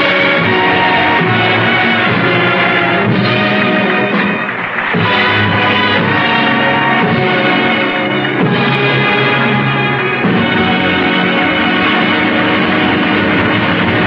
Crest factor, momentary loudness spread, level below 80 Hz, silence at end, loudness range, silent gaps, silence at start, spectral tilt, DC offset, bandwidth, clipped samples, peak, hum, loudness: 12 dB; 3 LU; -44 dBFS; 0 s; 1 LU; none; 0 s; -7.5 dB/octave; under 0.1%; 7.4 kHz; under 0.1%; 0 dBFS; none; -11 LUFS